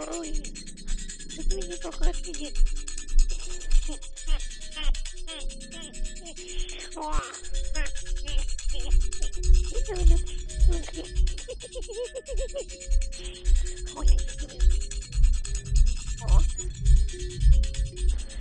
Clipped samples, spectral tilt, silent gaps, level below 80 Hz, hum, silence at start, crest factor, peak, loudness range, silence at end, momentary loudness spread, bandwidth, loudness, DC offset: under 0.1%; -4 dB/octave; none; -24 dBFS; none; 0 s; 18 dB; -6 dBFS; 8 LU; 0 s; 12 LU; 10 kHz; -31 LUFS; under 0.1%